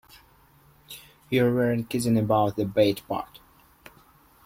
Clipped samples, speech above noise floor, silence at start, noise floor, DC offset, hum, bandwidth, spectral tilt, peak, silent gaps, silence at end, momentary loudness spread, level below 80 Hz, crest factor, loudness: under 0.1%; 34 dB; 0.9 s; -57 dBFS; under 0.1%; none; 16.5 kHz; -6.5 dB/octave; -8 dBFS; none; 1.2 s; 21 LU; -58 dBFS; 18 dB; -25 LUFS